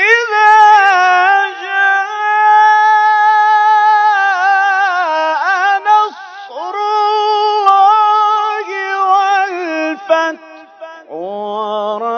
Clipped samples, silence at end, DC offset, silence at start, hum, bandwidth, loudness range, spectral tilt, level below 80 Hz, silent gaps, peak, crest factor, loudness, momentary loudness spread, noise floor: 0.2%; 0 s; under 0.1%; 0 s; none; 7.2 kHz; 6 LU; -1.5 dB/octave; -72 dBFS; none; 0 dBFS; 12 dB; -11 LUFS; 12 LU; -34 dBFS